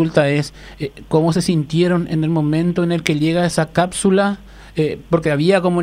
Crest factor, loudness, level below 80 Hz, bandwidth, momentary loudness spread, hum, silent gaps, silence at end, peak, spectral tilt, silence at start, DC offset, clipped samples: 16 dB; -17 LUFS; -44 dBFS; 15 kHz; 10 LU; none; none; 0 s; 0 dBFS; -6 dB/octave; 0 s; under 0.1%; under 0.1%